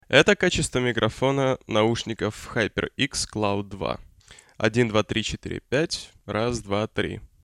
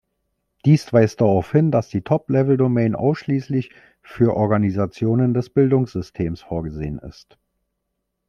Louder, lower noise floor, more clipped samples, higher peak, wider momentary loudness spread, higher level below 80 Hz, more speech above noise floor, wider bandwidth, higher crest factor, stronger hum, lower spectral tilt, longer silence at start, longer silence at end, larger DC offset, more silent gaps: second, -25 LUFS vs -20 LUFS; second, -52 dBFS vs -76 dBFS; neither; about the same, -2 dBFS vs -2 dBFS; about the same, 9 LU vs 10 LU; about the same, -46 dBFS vs -48 dBFS; second, 28 dB vs 58 dB; first, 13.5 kHz vs 9 kHz; about the same, 22 dB vs 18 dB; neither; second, -4.5 dB/octave vs -9 dB/octave; second, 0.1 s vs 0.65 s; second, 0.15 s vs 1.2 s; neither; neither